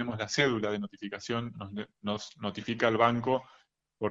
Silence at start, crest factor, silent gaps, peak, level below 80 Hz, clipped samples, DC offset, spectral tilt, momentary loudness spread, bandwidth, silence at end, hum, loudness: 0 s; 22 dB; none; -10 dBFS; -66 dBFS; under 0.1%; under 0.1%; -5 dB/octave; 13 LU; 8 kHz; 0 s; none; -31 LUFS